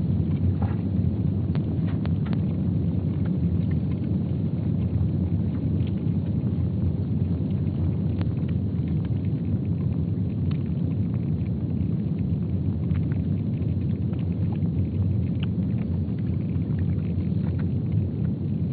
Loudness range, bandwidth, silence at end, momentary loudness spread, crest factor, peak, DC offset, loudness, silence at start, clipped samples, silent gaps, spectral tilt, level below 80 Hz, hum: 1 LU; 4.5 kHz; 0 s; 2 LU; 12 dB; -12 dBFS; under 0.1%; -26 LUFS; 0 s; under 0.1%; none; -10.5 dB/octave; -40 dBFS; none